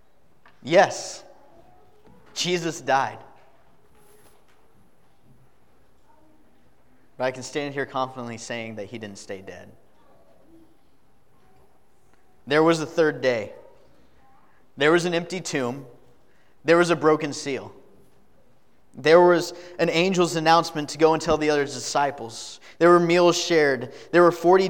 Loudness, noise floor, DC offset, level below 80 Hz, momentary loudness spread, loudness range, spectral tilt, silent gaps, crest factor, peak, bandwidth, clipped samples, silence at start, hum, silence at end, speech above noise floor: -22 LUFS; -63 dBFS; 0.3%; -60 dBFS; 18 LU; 14 LU; -4.5 dB/octave; none; 22 dB; -4 dBFS; 16.5 kHz; under 0.1%; 0.65 s; none; 0 s; 41 dB